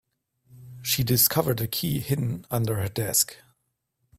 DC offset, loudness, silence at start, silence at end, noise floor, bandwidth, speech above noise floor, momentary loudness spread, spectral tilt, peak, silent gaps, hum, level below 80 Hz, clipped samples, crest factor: under 0.1%; -24 LUFS; 0.5 s; 0.85 s; -77 dBFS; 16 kHz; 52 dB; 8 LU; -4 dB/octave; -6 dBFS; none; none; -54 dBFS; under 0.1%; 22 dB